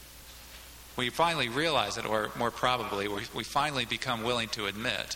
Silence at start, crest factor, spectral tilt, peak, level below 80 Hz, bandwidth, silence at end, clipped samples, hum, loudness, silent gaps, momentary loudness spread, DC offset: 0 s; 20 dB; -3.5 dB/octave; -12 dBFS; -56 dBFS; 17.5 kHz; 0 s; under 0.1%; none; -30 LUFS; none; 19 LU; under 0.1%